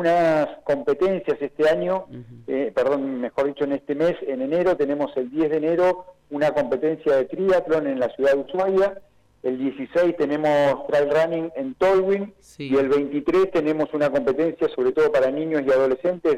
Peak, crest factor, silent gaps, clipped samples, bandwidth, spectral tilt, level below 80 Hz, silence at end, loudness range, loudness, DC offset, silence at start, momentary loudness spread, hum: -12 dBFS; 8 dB; none; under 0.1%; 11.5 kHz; -7 dB/octave; -56 dBFS; 0 s; 2 LU; -22 LUFS; under 0.1%; 0 s; 7 LU; none